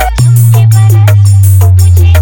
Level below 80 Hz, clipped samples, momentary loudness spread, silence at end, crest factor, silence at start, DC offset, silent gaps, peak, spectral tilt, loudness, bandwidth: -18 dBFS; 9%; 0 LU; 0 s; 4 dB; 0 s; under 0.1%; none; 0 dBFS; -6 dB/octave; -5 LUFS; 19.5 kHz